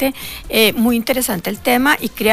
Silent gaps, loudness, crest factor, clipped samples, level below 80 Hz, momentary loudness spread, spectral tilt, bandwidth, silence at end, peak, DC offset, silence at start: none; -16 LUFS; 14 dB; under 0.1%; -40 dBFS; 7 LU; -3 dB/octave; 16 kHz; 0 s; -2 dBFS; under 0.1%; 0 s